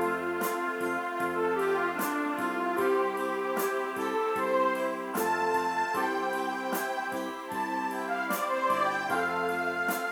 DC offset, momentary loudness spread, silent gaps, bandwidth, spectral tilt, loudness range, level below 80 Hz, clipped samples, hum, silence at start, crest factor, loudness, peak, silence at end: under 0.1%; 5 LU; none; over 20 kHz; -4 dB/octave; 1 LU; -74 dBFS; under 0.1%; none; 0 s; 14 dB; -30 LUFS; -16 dBFS; 0 s